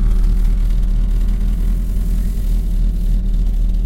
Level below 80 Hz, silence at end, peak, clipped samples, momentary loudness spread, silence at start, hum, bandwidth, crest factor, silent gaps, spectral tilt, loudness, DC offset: -14 dBFS; 0 s; -6 dBFS; under 0.1%; 2 LU; 0 s; none; 4.7 kHz; 10 dB; none; -7.5 dB/octave; -20 LUFS; under 0.1%